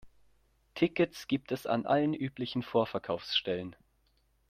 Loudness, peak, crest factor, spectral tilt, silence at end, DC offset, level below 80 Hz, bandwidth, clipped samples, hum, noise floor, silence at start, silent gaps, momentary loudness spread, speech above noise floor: -32 LUFS; -14 dBFS; 20 dB; -6 dB/octave; 0.75 s; under 0.1%; -68 dBFS; 15.5 kHz; under 0.1%; none; -71 dBFS; 0.05 s; none; 7 LU; 40 dB